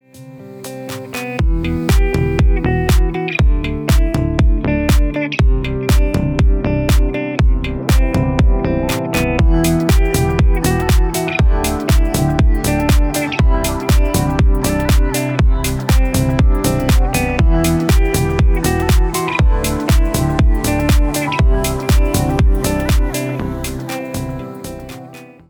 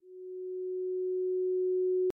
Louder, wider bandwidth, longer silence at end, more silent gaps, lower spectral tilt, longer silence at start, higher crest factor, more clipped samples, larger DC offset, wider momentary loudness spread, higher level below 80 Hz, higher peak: first, -16 LUFS vs -33 LUFS; first, over 20 kHz vs 1.4 kHz; first, 0.25 s vs 0.05 s; neither; first, -6 dB/octave vs -3 dB/octave; about the same, 0.15 s vs 0.05 s; about the same, 12 dB vs 8 dB; neither; neither; second, 8 LU vs 11 LU; first, -16 dBFS vs -76 dBFS; first, -2 dBFS vs -26 dBFS